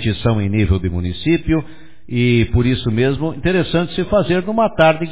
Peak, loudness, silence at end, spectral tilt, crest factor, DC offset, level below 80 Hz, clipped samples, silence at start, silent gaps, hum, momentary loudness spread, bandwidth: 0 dBFS; -17 LUFS; 0 s; -11 dB/octave; 16 dB; 2%; -30 dBFS; under 0.1%; 0 s; none; none; 6 LU; 4 kHz